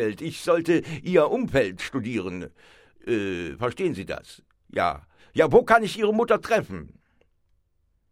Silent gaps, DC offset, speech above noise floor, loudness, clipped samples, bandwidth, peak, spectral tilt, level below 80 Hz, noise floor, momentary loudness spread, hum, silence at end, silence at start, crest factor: none; under 0.1%; 45 dB; -24 LUFS; under 0.1%; 14.5 kHz; -4 dBFS; -6 dB/octave; -52 dBFS; -68 dBFS; 17 LU; none; 1.25 s; 0 s; 22 dB